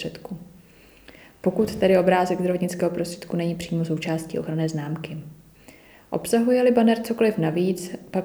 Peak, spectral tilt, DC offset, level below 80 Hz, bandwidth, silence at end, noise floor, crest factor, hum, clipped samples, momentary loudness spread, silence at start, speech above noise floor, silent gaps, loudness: -6 dBFS; -6.5 dB/octave; under 0.1%; -56 dBFS; over 20 kHz; 0 s; -51 dBFS; 18 dB; none; under 0.1%; 14 LU; 0 s; 29 dB; none; -23 LUFS